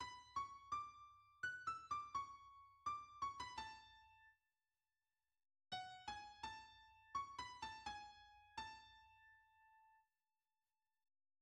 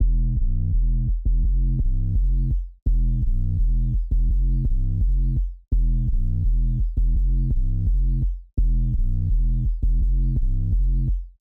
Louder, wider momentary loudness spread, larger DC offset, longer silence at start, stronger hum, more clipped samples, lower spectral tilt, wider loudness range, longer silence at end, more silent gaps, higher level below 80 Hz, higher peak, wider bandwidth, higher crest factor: second, -51 LUFS vs -25 LUFS; first, 18 LU vs 2 LU; neither; about the same, 0 s vs 0 s; neither; neither; second, -2 dB/octave vs -12 dB/octave; first, 8 LU vs 0 LU; first, 1.4 s vs 0.1 s; second, none vs 2.82-2.86 s; second, -78 dBFS vs -20 dBFS; second, -36 dBFS vs -10 dBFS; first, 11 kHz vs 0.6 kHz; first, 18 dB vs 10 dB